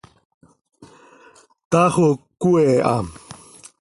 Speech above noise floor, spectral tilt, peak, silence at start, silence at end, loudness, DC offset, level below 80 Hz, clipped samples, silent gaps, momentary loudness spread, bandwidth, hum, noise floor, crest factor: 35 dB; -7 dB/octave; -2 dBFS; 0.8 s; 0.45 s; -18 LUFS; under 0.1%; -52 dBFS; under 0.1%; 1.65-1.71 s; 24 LU; 11.5 kHz; none; -51 dBFS; 18 dB